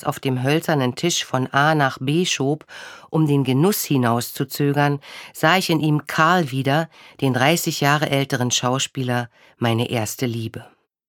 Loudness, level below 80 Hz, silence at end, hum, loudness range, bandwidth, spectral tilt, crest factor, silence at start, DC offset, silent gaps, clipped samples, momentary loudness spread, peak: -20 LUFS; -64 dBFS; 0.45 s; none; 2 LU; 19 kHz; -4.5 dB/octave; 18 dB; 0 s; under 0.1%; none; under 0.1%; 9 LU; -2 dBFS